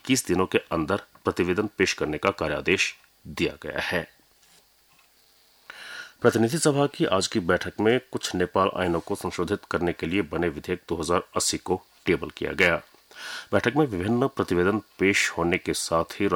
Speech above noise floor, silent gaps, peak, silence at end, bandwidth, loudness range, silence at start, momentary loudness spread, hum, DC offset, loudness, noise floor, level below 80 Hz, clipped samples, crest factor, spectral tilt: 35 dB; none; -6 dBFS; 0 s; over 20 kHz; 5 LU; 0.05 s; 8 LU; none; under 0.1%; -25 LUFS; -60 dBFS; -52 dBFS; under 0.1%; 20 dB; -4.5 dB/octave